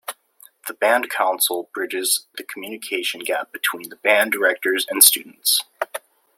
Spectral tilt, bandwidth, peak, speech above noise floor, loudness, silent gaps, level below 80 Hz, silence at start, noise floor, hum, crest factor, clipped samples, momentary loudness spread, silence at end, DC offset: 0.5 dB/octave; 16.5 kHz; 0 dBFS; 31 dB; -19 LUFS; none; -74 dBFS; 0.1 s; -52 dBFS; none; 22 dB; under 0.1%; 20 LU; 0.4 s; under 0.1%